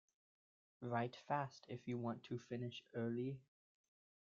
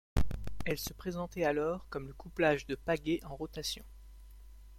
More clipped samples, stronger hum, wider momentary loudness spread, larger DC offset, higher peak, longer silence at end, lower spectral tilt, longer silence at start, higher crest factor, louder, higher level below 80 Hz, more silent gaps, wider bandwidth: neither; neither; second, 7 LU vs 13 LU; neither; second, -26 dBFS vs -18 dBFS; first, 0.85 s vs 0 s; about the same, -6 dB/octave vs -5 dB/octave; first, 0.8 s vs 0.15 s; about the same, 22 dB vs 18 dB; second, -46 LUFS vs -36 LUFS; second, -84 dBFS vs -46 dBFS; neither; second, 7.4 kHz vs 16.5 kHz